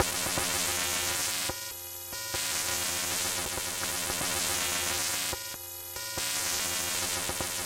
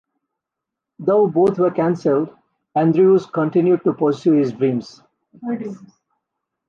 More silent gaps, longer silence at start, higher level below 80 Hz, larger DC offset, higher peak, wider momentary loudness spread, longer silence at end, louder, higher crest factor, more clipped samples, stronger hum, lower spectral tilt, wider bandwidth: neither; second, 0 s vs 1 s; first, -54 dBFS vs -64 dBFS; neither; about the same, -8 dBFS vs -6 dBFS; second, 9 LU vs 13 LU; second, 0 s vs 0.9 s; second, -29 LUFS vs -18 LUFS; first, 24 dB vs 14 dB; neither; neither; second, -0.5 dB/octave vs -9 dB/octave; first, 17 kHz vs 7.2 kHz